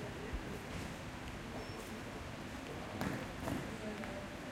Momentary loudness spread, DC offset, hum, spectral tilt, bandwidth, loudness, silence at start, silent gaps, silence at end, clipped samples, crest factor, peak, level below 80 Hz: 5 LU; under 0.1%; none; -5 dB/octave; 16 kHz; -44 LUFS; 0 s; none; 0 s; under 0.1%; 20 dB; -24 dBFS; -54 dBFS